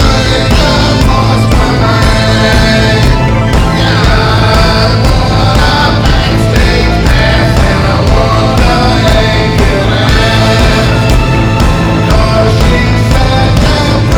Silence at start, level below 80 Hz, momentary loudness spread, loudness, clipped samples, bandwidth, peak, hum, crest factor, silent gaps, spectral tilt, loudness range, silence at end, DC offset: 0 s; -12 dBFS; 2 LU; -8 LUFS; 0.4%; 16.5 kHz; 0 dBFS; none; 6 dB; none; -5.5 dB/octave; 1 LU; 0 s; under 0.1%